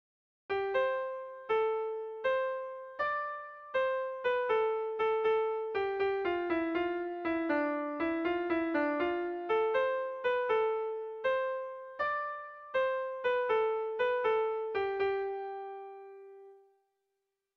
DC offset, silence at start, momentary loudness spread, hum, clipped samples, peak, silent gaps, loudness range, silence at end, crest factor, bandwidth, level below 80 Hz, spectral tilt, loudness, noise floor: under 0.1%; 0.5 s; 10 LU; none; under 0.1%; -20 dBFS; none; 2 LU; 1 s; 14 dB; 6 kHz; -70 dBFS; -6 dB/octave; -33 LUFS; -85 dBFS